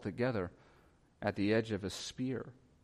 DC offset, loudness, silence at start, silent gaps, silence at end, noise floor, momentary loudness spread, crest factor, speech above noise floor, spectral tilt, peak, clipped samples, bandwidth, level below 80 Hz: under 0.1%; -37 LUFS; 0 s; none; 0.3 s; -66 dBFS; 11 LU; 18 dB; 30 dB; -5.5 dB/octave; -20 dBFS; under 0.1%; 14.5 kHz; -66 dBFS